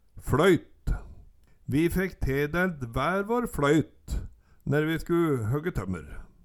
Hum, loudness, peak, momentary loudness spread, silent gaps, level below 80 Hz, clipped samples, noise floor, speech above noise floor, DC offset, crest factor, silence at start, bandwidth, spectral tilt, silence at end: none; -28 LUFS; -10 dBFS; 14 LU; none; -40 dBFS; under 0.1%; -54 dBFS; 28 dB; under 0.1%; 18 dB; 0.15 s; 18.5 kHz; -6.5 dB/octave; 0.2 s